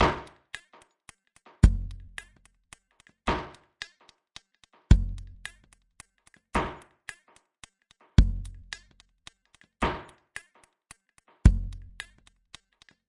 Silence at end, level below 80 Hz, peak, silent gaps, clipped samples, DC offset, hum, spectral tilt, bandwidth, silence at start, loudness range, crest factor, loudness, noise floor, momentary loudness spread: 1.3 s; -32 dBFS; -4 dBFS; none; under 0.1%; under 0.1%; none; -6.5 dB/octave; 11 kHz; 0 s; 1 LU; 26 dB; -28 LUFS; -65 dBFS; 27 LU